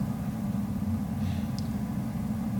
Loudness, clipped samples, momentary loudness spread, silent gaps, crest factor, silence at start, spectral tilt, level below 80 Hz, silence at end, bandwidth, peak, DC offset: -32 LUFS; under 0.1%; 1 LU; none; 12 dB; 0 s; -7.5 dB/octave; -46 dBFS; 0 s; 19 kHz; -18 dBFS; under 0.1%